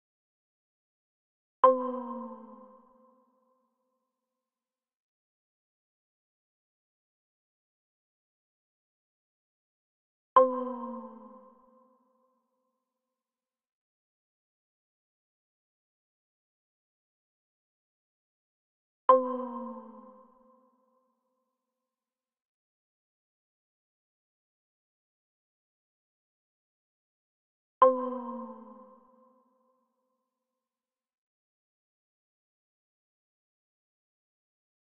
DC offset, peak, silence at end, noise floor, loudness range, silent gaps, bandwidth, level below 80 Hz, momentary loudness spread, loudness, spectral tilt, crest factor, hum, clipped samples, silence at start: under 0.1%; -8 dBFS; 6.15 s; under -90 dBFS; 14 LU; 4.96-10.36 s, 13.72-19.08 s, 22.45-27.81 s; 3.5 kHz; -86 dBFS; 21 LU; -27 LUFS; 1 dB/octave; 30 dB; none; under 0.1%; 1.65 s